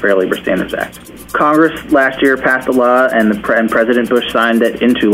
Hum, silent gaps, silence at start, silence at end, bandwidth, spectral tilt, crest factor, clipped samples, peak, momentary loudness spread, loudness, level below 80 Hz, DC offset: none; none; 0 s; 0 s; 16 kHz; -5.5 dB/octave; 12 dB; under 0.1%; 0 dBFS; 7 LU; -12 LUFS; -44 dBFS; under 0.1%